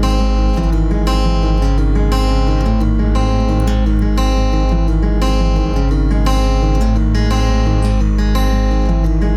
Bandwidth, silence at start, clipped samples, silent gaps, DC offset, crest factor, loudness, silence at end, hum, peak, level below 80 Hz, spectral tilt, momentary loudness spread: 11.5 kHz; 0 s; under 0.1%; none; under 0.1%; 10 dB; -15 LUFS; 0 s; none; -2 dBFS; -14 dBFS; -7 dB/octave; 1 LU